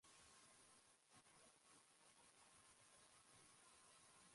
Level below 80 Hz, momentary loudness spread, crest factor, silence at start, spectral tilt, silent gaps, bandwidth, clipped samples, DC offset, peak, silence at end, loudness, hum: under -90 dBFS; 2 LU; 16 dB; 0 s; -1 dB/octave; none; 11.5 kHz; under 0.1%; under 0.1%; -56 dBFS; 0 s; -69 LUFS; none